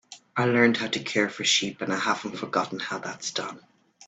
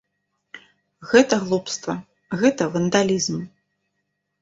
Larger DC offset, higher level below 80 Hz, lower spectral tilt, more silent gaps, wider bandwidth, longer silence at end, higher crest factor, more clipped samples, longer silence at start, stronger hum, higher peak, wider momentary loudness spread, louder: neither; second, -70 dBFS vs -62 dBFS; second, -3 dB/octave vs -4.5 dB/octave; neither; first, 9.2 kHz vs 8 kHz; second, 0.05 s vs 0.95 s; about the same, 22 dB vs 20 dB; neither; second, 0.1 s vs 0.55 s; neither; second, -6 dBFS vs -2 dBFS; second, 11 LU vs 15 LU; second, -26 LUFS vs -21 LUFS